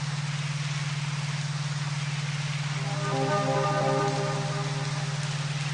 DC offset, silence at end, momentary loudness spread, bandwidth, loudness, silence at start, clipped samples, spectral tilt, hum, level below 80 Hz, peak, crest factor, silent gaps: under 0.1%; 0 s; 5 LU; 10.5 kHz; -29 LUFS; 0 s; under 0.1%; -5 dB/octave; none; -64 dBFS; -14 dBFS; 14 dB; none